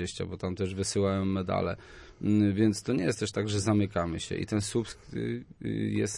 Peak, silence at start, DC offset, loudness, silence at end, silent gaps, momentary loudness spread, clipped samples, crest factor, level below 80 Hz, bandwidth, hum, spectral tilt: -12 dBFS; 0 s; under 0.1%; -30 LUFS; 0 s; none; 9 LU; under 0.1%; 16 dB; -56 dBFS; 11.5 kHz; none; -5.5 dB/octave